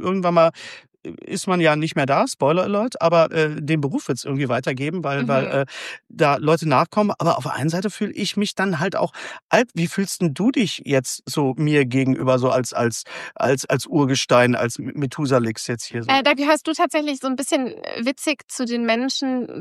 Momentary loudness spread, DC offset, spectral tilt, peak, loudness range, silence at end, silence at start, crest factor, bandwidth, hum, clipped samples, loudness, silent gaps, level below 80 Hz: 9 LU; under 0.1%; -5 dB/octave; -2 dBFS; 2 LU; 0 s; 0 s; 18 dB; 14 kHz; none; under 0.1%; -20 LUFS; 9.42-9.49 s, 18.44-18.48 s; -66 dBFS